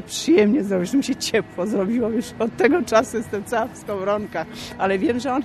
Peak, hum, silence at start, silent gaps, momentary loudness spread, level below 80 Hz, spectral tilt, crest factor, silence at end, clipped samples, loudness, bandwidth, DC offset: -4 dBFS; none; 0 s; none; 10 LU; -52 dBFS; -5 dB/octave; 18 dB; 0 s; under 0.1%; -21 LUFS; 13 kHz; under 0.1%